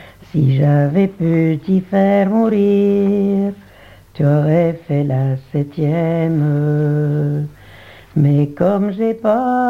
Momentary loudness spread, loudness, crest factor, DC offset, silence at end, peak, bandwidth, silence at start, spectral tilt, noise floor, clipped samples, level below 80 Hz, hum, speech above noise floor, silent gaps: 6 LU; -16 LUFS; 14 dB; 0.1%; 0 s; 0 dBFS; 4.8 kHz; 0 s; -10.5 dB/octave; -40 dBFS; under 0.1%; -52 dBFS; none; 26 dB; none